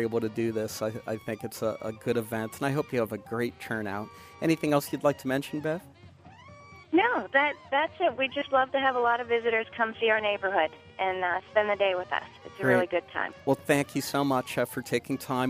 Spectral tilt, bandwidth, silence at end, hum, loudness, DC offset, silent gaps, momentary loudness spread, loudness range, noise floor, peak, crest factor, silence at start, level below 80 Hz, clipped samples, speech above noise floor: -5 dB/octave; 15.5 kHz; 0 s; none; -28 LUFS; under 0.1%; none; 9 LU; 5 LU; -52 dBFS; -10 dBFS; 18 dB; 0 s; -66 dBFS; under 0.1%; 23 dB